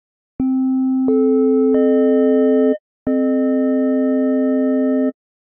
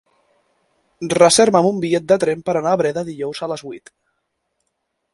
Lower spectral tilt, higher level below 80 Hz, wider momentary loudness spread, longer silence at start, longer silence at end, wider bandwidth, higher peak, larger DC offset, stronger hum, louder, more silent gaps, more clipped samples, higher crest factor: first, -7 dB/octave vs -4 dB/octave; about the same, -56 dBFS vs -58 dBFS; second, 6 LU vs 17 LU; second, 0.4 s vs 1 s; second, 0.4 s vs 1.35 s; second, 3.2 kHz vs 11.5 kHz; second, -6 dBFS vs 0 dBFS; neither; neither; about the same, -16 LUFS vs -17 LUFS; first, 2.80-3.06 s vs none; neither; second, 10 dB vs 18 dB